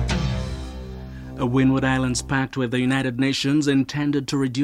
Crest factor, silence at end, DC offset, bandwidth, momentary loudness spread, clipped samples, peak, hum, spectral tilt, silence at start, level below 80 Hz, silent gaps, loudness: 16 dB; 0 s; under 0.1%; 12.5 kHz; 15 LU; under 0.1%; -6 dBFS; none; -5.5 dB/octave; 0 s; -36 dBFS; none; -22 LUFS